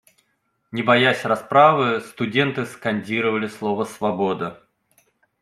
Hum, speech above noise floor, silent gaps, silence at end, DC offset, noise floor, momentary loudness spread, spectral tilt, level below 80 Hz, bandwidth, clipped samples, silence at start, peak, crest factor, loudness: none; 50 dB; none; 0.85 s; under 0.1%; -70 dBFS; 11 LU; -5.5 dB/octave; -66 dBFS; 14 kHz; under 0.1%; 0.75 s; -2 dBFS; 20 dB; -20 LUFS